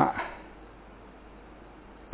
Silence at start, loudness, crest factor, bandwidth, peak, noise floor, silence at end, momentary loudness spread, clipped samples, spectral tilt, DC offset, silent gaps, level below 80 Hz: 0 s; -34 LUFS; 28 dB; 4 kHz; -6 dBFS; -49 dBFS; 0 s; 15 LU; under 0.1%; -5 dB/octave; under 0.1%; none; -54 dBFS